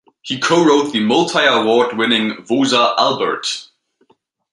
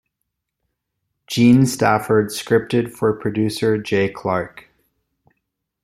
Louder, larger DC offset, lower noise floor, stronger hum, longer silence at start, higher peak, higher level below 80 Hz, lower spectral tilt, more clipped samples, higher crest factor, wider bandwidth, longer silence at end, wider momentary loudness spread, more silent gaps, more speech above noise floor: first, -15 LUFS vs -18 LUFS; neither; second, -59 dBFS vs -78 dBFS; neither; second, 0.25 s vs 1.3 s; about the same, 0 dBFS vs -2 dBFS; second, -64 dBFS vs -56 dBFS; second, -3.5 dB/octave vs -6 dB/octave; neither; about the same, 16 dB vs 18 dB; second, 11.5 kHz vs 15.5 kHz; second, 0.9 s vs 1.25 s; about the same, 8 LU vs 9 LU; neither; second, 44 dB vs 60 dB